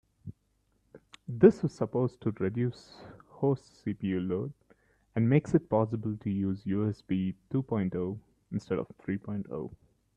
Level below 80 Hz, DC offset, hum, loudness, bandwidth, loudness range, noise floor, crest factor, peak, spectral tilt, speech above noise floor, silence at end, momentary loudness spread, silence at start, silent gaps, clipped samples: -64 dBFS; under 0.1%; none; -31 LUFS; 8.8 kHz; 4 LU; -73 dBFS; 24 dB; -8 dBFS; -9 dB/octave; 43 dB; 0.4 s; 19 LU; 0.25 s; none; under 0.1%